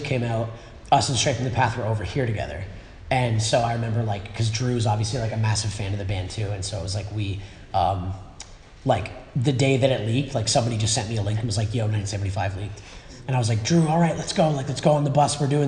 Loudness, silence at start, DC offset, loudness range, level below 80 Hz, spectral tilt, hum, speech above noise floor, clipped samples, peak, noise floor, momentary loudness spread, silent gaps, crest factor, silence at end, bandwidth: -24 LUFS; 0 s; under 0.1%; 4 LU; -44 dBFS; -5 dB/octave; none; 20 dB; under 0.1%; -4 dBFS; -43 dBFS; 12 LU; none; 20 dB; 0 s; 10.5 kHz